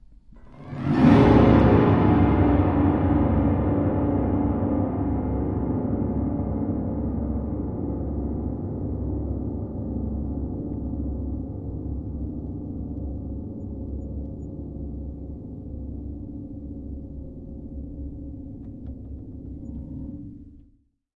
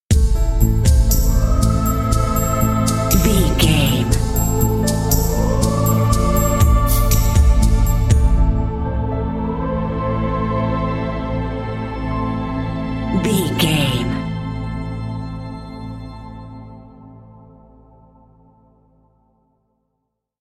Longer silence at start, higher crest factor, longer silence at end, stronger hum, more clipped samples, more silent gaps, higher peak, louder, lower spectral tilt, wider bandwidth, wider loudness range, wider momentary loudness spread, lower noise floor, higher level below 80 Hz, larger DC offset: about the same, 0.1 s vs 0.1 s; about the same, 20 dB vs 16 dB; second, 0.55 s vs 3.3 s; neither; neither; neither; about the same, -4 dBFS vs -2 dBFS; second, -24 LUFS vs -18 LUFS; first, -10.5 dB/octave vs -5.5 dB/octave; second, 6.2 kHz vs 16 kHz; first, 19 LU vs 13 LU; first, 19 LU vs 12 LU; second, -60 dBFS vs -74 dBFS; second, -34 dBFS vs -20 dBFS; neither